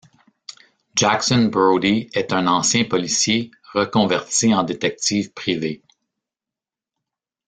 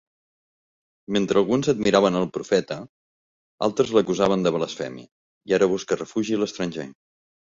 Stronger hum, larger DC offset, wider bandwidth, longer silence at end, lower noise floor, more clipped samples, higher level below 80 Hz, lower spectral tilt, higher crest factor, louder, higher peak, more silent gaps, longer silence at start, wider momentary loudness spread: neither; neither; first, 9.6 kHz vs 7.8 kHz; first, 1.7 s vs 0.65 s; about the same, -89 dBFS vs under -90 dBFS; neither; about the same, -56 dBFS vs -60 dBFS; second, -3.5 dB/octave vs -5.5 dB/octave; about the same, 18 dB vs 20 dB; first, -19 LUFS vs -23 LUFS; about the same, -2 dBFS vs -4 dBFS; second, none vs 2.89-3.58 s, 5.12-5.41 s; second, 0.5 s vs 1.1 s; second, 9 LU vs 14 LU